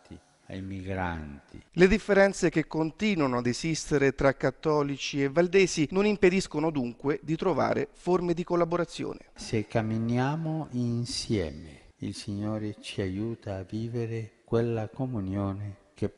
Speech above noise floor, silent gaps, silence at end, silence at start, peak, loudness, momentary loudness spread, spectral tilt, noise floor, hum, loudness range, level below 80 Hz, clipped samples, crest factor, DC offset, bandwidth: 23 dB; none; 0.05 s; 0.1 s; -8 dBFS; -28 LUFS; 14 LU; -6 dB/octave; -51 dBFS; none; 7 LU; -50 dBFS; under 0.1%; 20 dB; under 0.1%; 11.5 kHz